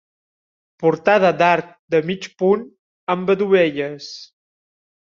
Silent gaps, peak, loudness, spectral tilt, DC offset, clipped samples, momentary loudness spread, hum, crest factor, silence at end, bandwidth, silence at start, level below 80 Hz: 1.79-1.88 s, 2.79-3.07 s; -2 dBFS; -18 LUFS; -4 dB/octave; under 0.1%; under 0.1%; 15 LU; none; 18 dB; 0.8 s; 7.2 kHz; 0.8 s; -64 dBFS